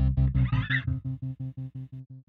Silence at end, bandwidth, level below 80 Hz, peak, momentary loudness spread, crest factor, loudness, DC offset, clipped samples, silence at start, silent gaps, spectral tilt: 0.05 s; 4.3 kHz; -34 dBFS; -14 dBFS; 15 LU; 14 dB; -29 LUFS; under 0.1%; under 0.1%; 0 s; none; -9 dB/octave